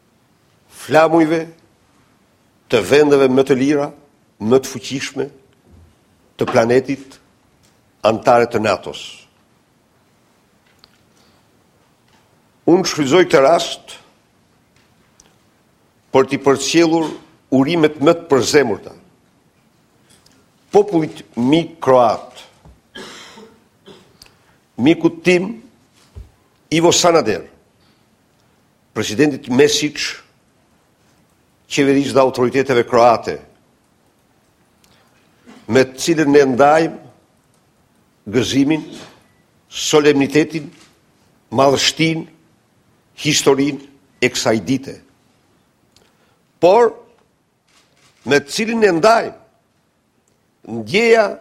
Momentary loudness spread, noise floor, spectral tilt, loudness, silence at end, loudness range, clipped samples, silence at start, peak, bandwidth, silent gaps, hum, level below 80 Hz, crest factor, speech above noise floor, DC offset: 17 LU; -61 dBFS; -4.5 dB/octave; -15 LUFS; 0.05 s; 4 LU; under 0.1%; 0.8 s; 0 dBFS; 15.5 kHz; none; none; -54 dBFS; 18 dB; 47 dB; under 0.1%